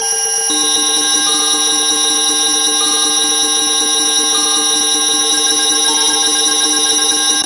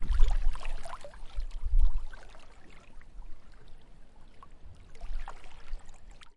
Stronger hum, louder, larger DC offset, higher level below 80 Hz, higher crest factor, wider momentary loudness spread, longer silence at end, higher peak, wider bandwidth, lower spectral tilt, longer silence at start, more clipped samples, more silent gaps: neither; first, -10 LUFS vs -38 LUFS; neither; second, -58 dBFS vs -32 dBFS; second, 12 dB vs 20 dB; second, 1 LU vs 25 LU; about the same, 0 s vs 0.05 s; first, 0 dBFS vs -8 dBFS; first, 11.5 kHz vs 5.2 kHz; second, 2 dB/octave vs -5.5 dB/octave; about the same, 0 s vs 0 s; neither; neither